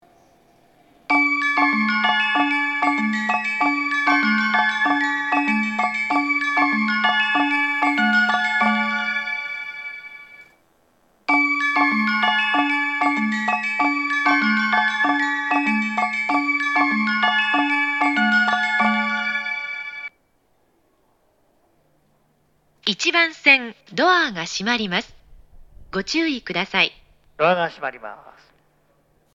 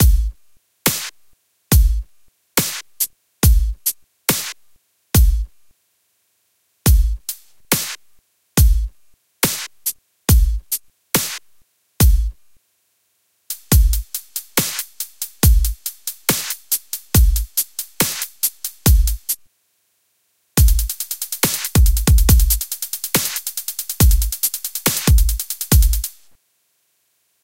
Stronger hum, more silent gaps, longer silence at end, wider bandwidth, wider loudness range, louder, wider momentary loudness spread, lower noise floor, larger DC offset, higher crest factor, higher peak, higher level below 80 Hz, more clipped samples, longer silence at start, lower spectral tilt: neither; neither; second, 1.15 s vs 1.35 s; second, 9.2 kHz vs 17 kHz; about the same, 5 LU vs 4 LU; about the same, -19 LUFS vs -19 LUFS; about the same, 9 LU vs 11 LU; about the same, -64 dBFS vs -65 dBFS; second, under 0.1% vs 0.3%; about the same, 20 dB vs 18 dB; about the same, -2 dBFS vs 0 dBFS; second, -60 dBFS vs -20 dBFS; neither; first, 1.1 s vs 0 s; about the same, -3.5 dB/octave vs -3.5 dB/octave